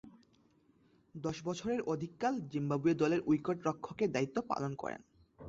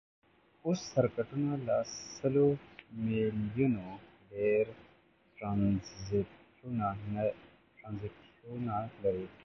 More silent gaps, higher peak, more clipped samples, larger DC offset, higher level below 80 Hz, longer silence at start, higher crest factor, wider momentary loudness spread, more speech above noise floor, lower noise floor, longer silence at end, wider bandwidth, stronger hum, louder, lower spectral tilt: neither; second, -20 dBFS vs -14 dBFS; neither; neither; second, -70 dBFS vs -60 dBFS; second, 0.05 s vs 0.65 s; about the same, 16 dB vs 20 dB; second, 11 LU vs 16 LU; about the same, 34 dB vs 32 dB; about the same, -69 dBFS vs -66 dBFS; about the same, 0 s vs 0.1 s; about the same, 7.8 kHz vs 7.4 kHz; neither; about the same, -36 LUFS vs -34 LUFS; about the same, -6.5 dB/octave vs -7 dB/octave